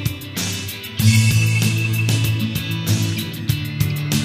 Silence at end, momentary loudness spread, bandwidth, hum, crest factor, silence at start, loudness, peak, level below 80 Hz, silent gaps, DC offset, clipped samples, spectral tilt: 0 s; 9 LU; 16 kHz; none; 16 dB; 0 s; -19 LUFS; -2 dBFS; -42 dBFS; none; under 0.1%; under 0.1%; -4.5 dB/octave